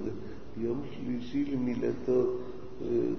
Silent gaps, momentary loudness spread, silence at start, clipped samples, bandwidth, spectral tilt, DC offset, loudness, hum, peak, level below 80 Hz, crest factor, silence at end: none; 12 LU; 0 s; under 0.1%; 6.4 kHz; -8.5 dB/octave; 1%; -33 LUFS; none; -18 dBFS; -54 dBFS; 14 dB; 0 s